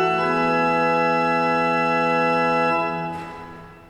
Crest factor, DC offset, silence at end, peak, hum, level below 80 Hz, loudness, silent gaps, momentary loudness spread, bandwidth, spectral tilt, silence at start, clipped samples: 12 dB; under 0.1%; 0.1 s; -8 dBFS; none; -54 dBFS; -20 LUFS; none; 13 LU; 11.5 kHz; -6 dB/octave; 0 s; under 0.1%